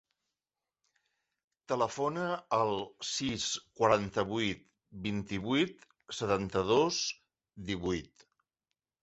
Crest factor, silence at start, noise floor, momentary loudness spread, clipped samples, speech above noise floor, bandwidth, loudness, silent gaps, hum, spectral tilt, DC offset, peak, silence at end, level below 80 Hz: 22 dB; 1.7 s; under -90 dBFS; 10 LU; under 0.1%; over 58 dB; 8.2 kHz; -33 LUFS; none; none; -4 dB/octave; under 0.1%; -12 dBFS; 0.95 s; -60 dBFS